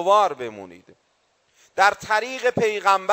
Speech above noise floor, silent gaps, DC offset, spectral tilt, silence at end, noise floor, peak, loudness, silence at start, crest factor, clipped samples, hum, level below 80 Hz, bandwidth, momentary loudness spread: 46 dB; none; under 0.1%; -3 dB/octave; 0 s; -66 dBFS; -4 dBFS; -20 LUFS; 0 s; 18 dB; under 0.1%; none; -64 dBFS; 16 kHz; 15 LU